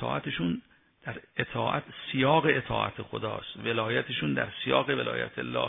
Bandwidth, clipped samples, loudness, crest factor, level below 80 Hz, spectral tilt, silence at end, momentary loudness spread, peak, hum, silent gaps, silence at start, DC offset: 3.9 kHz; under 0.1%; -29 LUFS; 22 dB; -58 dBFS; -9 dB/octave; 0 s; 11 LU; -8 dBFS; none; none; 0 s; under 0.1%